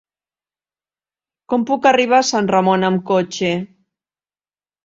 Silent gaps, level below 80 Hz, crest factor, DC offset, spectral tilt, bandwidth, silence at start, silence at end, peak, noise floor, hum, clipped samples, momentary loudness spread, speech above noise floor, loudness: none; -62 dBFS; 18 dB; under 0.1%; -4.5 dB/octave; 7.8 kHz; 1.5 s; 1.2 s; -2 dBFS; under -90 dBFS; none; under 0.1%; 8 LU; over 74 dB; -16 LUFS